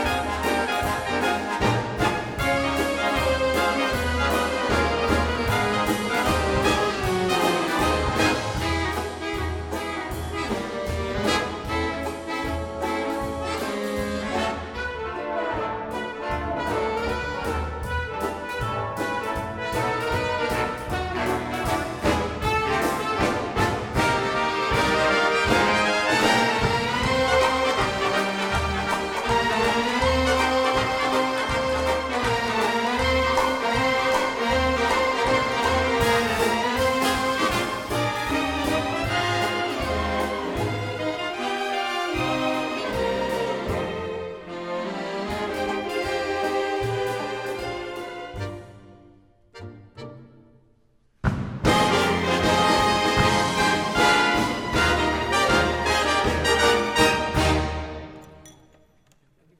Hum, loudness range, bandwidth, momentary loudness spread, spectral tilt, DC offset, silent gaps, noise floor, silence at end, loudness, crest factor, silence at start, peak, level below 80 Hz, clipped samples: none; 7 LU; 18 kHz; 9 LU; -4.5 dB/octave; under 0.1%; none; -63 dBFS; 1.1 s; -23 LUFS; 20 dB; 0 s; -4 dBFS; -38 dBFS; under 0.1%